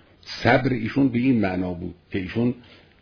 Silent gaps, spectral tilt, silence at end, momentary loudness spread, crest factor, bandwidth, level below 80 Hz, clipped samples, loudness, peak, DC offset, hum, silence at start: none; -7.5 dB/octave; 0.4 s; 13 LU; 22 dB; 5.4 kHz; -50 dBFS; under 0.1%; -23 LUFS; -2 dBFS; under 0.1%; none; 0.25 s